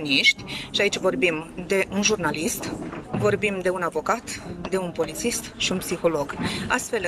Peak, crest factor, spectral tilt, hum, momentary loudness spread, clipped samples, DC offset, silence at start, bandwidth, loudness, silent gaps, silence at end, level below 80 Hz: -4 dBFS; 20 dB; -3 dB/octave; none; 8 LU; under 0.1%; under 0.1%; 0 s; 15.5 kHz; -24 LUFS; none; 0 s; -50 dBFS